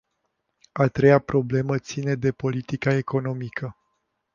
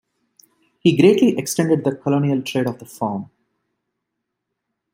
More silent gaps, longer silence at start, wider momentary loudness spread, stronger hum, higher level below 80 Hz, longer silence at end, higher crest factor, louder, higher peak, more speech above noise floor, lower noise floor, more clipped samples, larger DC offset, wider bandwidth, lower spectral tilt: neither; about the same, 0.75 s vs 0.85 s; about the same, 14 LU vs 12 LU; neither; first, -54 dBFS vs -64 dBFS; second, 0.65 s vs 1.7 s; about the same, 20 dB vs 18 dB; second, -23 LUFS vs -18 LUFS; about the same, -4 dBFS vs -2 dBFS; second, 53 dB vs 61 dB; about the same, -76 dBFS vs -79 dBFS; neither; neither; second, 7.2 kHz vs 16 kHz; first, -7.5 dB/octave vs -6 dB/octave